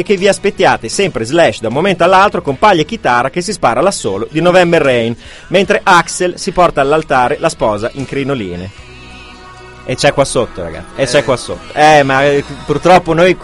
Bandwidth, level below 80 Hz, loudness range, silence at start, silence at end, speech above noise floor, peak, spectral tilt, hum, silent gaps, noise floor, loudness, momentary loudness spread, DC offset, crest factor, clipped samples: 12 kHz; -36 dBFS; 6 LU; 0 s; 0 s; 22 dB; 0 dBFS; -4.5 dB/octave; none; none; -33 dBFS; -11 LUFS; 11 LU; under 0.1%; 12 dB; 0.4%